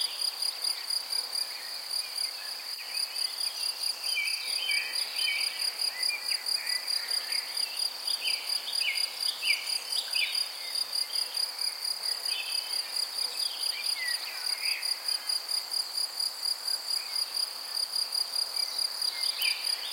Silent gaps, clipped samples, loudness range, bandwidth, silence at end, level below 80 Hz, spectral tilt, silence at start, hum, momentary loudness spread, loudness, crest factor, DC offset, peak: none; under 0.1%; 2 LU; 16.5 kHz; 0 s; under -90 dBFS; 4.5 dB/octave; 0 s; none; 4 LU; -29 LUFS; 20 dB; under 0.1%; -12 dBFS